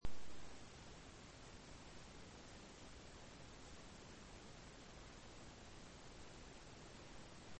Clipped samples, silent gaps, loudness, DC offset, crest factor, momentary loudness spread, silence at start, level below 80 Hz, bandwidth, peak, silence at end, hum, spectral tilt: under 0.1%; none; -59 LUFS; under 0.1%; 20 dB; 0 LU; 0 s; -62 dBFS; 8.4 kHz; -30 dBFS; 0 s; none; -4 dB/octave